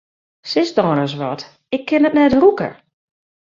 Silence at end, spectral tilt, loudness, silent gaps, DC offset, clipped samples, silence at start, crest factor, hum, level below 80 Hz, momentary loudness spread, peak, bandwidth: 0.85 s; -6.5 dB/octave; -16 LUFS; none; under 0.1%; under 0.1%; 0.45 s; 16 dB; none; -50 dBFS; 14 LU; -2 dBFS; 7.4 kHz